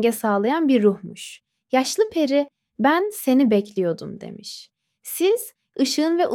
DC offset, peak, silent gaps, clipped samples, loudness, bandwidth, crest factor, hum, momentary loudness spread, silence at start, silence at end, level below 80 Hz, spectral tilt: under 0.1%; -6 dBFS; none; under 0.1%; -21 LUFS; 17 kHz; 16 dB; none; 18 LU; 0 s; 0 s; -68 dBFS; -4.5 dB/octave